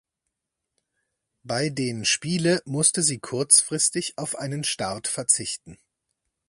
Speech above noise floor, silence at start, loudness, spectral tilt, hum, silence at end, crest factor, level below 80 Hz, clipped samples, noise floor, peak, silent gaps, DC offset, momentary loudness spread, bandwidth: 59 dB; 1.45 s; -22 LUFS; -2.5 dB/octave; none; 0.75 s; 24 dB; -64 dBFS; under 0.1%; -83 dBFS; -2 dBFS; none; under 0.1%; 13 LU; 11.5 kHz